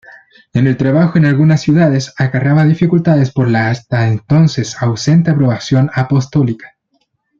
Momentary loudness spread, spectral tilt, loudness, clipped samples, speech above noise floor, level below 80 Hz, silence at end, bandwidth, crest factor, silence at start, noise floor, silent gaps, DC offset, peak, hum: 5 LU; -7.5 dB/octave; -12 LUFS; under 0.1%; 52 dB; -46 dBFS; 0.75 s; 7.6 kHz; 12 dB; 0.55 s; -63 dBFS; none; under 0.1%; 0 dBFS; none